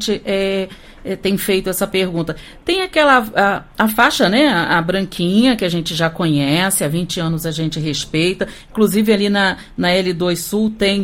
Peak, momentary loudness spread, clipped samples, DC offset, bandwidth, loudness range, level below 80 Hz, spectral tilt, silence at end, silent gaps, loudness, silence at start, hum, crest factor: 0 dBFS; 8 LU; under 0.1%; under 0.1%; 16.5 kHz; 3 LU; -42 dBFS; -4.5 dB/octave; 0 s; none; -16 LUFS; 0 s; none; 16 dB